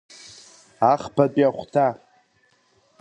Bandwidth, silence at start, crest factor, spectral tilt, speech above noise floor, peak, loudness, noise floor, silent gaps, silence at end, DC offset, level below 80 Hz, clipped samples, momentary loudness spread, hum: 10 kHz; 0.8 s; 22 dB; -7 dB/octave; 43 dB; -2 dBFS; -21 LUFS; -63 dBFS; none; 1.05 s; under 0.1%; -64 dBFS; under 0.1%; 23 LU; none